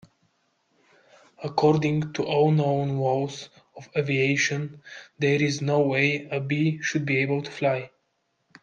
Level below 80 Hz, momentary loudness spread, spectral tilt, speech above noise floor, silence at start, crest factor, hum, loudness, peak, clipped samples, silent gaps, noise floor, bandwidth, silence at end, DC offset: -66 dBFS; 13 LU; -6 dB/octave; 49 dB; 1.4 s; 18 dB; none; -24 LUFS; -8 dBFS; under 0.1%; none; -74 dBFS; 7.4 kHz; 0.75 s; under 0.1%